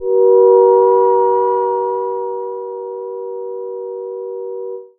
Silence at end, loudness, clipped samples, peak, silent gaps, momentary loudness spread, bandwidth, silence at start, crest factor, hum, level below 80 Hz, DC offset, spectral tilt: 0.1 s; -13 LUFS; under 0.1%; 0 dBFS; none; 16 LU; 2 kHz; 0 s; 14 dB; none; -68 dBFS; under 0.1%; -11.5 dB/octave